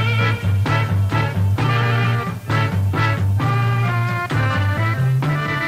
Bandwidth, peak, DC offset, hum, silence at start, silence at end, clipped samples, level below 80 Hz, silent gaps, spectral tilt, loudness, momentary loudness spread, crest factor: 15.5 kHz; -6 dBFS; under 0.1%; none; 0 s; 0 s; under 0.1%; -42 dBFS; none; -7 dB/octave; -19 LUFS; 2 LU; 12 dB